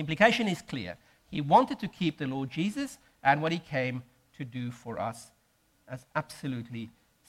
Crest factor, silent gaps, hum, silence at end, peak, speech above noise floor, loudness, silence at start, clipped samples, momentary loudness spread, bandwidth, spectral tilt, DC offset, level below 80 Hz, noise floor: 24 dB; none; none; 0.4 s; -8 dBFS; 39 dB; -30 LUFS; 0 s; under 0.1%; 18 LU; 16 kHz; -5.5 dB/octave; under 0.1%; -64 dBFS; -69 dBFS